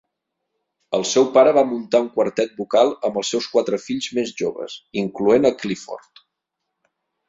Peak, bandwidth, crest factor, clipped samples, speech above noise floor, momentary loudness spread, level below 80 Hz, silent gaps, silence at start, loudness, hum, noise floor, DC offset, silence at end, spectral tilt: -2 dBFS; 7.8 kHz; 18 dB; under 0.1%; 60 dB; 13 LU; -64 dBFS; none; 0.9 s; -20 LUFS; none; -80 dBFS; under 0.1%; 1.3 s; -4 dB/octave